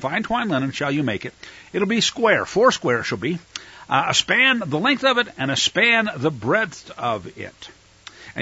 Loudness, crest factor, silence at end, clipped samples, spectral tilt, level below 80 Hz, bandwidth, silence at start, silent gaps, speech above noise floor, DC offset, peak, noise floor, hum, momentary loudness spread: -20 LUFS; 18 dB; 0 s; under 0.1%; -3.5 dB/octave; -56 dBFS; 8 kHz; 0 s; none; 23 dB; under 0.1%; -4 dBFS; -44 dBFS; none; 16 LU